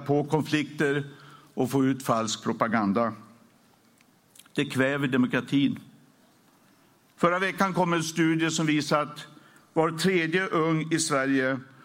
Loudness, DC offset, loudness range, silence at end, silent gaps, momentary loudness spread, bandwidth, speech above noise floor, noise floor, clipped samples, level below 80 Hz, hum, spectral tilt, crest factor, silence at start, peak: -26 LUFS; under 0.1%; 3 LU; 0.2 s; none; 7 LU; 16.5 kHz; 36 dB; -61 dBFS; under 0.1%; -72 dBFS; none; -5 dB/octave; 20 dB; 0 s; -8 dBFS